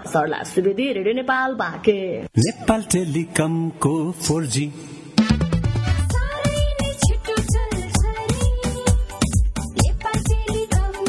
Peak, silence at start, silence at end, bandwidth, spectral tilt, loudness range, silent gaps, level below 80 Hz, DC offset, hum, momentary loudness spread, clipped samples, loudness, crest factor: -2 dBFS; 0 s; 0 s; 12 kHz; -5 dB/octave; 1 LU; none; -26 dBFS; under 0.1%; none; 3 LU; under 0.1%; -21 LUFS; 18 dB